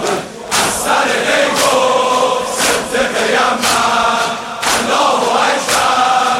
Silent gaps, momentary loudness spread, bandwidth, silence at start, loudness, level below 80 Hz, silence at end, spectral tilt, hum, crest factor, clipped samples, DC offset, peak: none; 4 LU; 16.5 kHz; 0 s; -13 LUFS; -46 dBFS; 0 s; -1.5 dB/octave; none; 12 dB; under 0.1%; under 0.1%; 0 dBFS